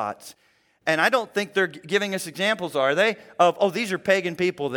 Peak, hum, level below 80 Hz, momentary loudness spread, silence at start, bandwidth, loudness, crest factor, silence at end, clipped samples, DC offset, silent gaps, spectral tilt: -4 dBFS; none; -72 dBFS; 6 LU; 0 s; 18 kHz; -23 LUFS; 20 dB; 0 s; under 0.1%; under 0.1%; none; -4 dB/octave